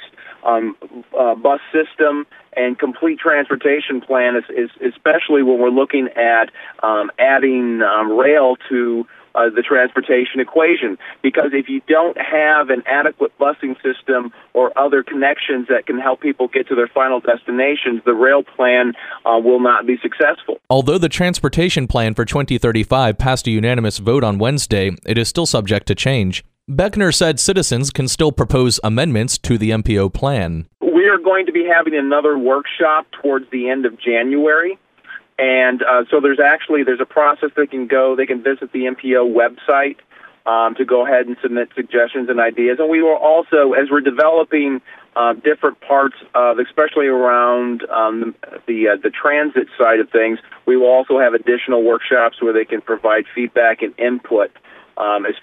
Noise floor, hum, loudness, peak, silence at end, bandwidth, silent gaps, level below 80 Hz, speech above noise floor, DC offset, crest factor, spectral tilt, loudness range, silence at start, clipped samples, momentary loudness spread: -38 dBFS; none; -15 LUFS; -2 dBFS; 0.05 s; 15.5 kHz; none; -40 dBFS; 23 dB; under 0.1%; 14 dB; -5 dB/octave; 2 LU; 0 s; under 0.1%; 7 LU